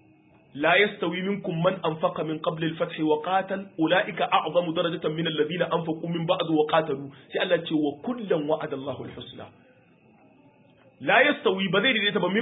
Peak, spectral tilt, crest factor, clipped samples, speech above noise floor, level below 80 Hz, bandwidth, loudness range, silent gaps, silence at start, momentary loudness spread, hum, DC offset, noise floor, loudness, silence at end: -4 dBFS; -10 dB/octave; 22 dB; under 0.1%; 32 dB; -68 dBFS; 4 kHz; 4 LU; none; 0.55 s; 12 LU; none; under 0.1%; -57 dBFS; -25 LUFS; 0 s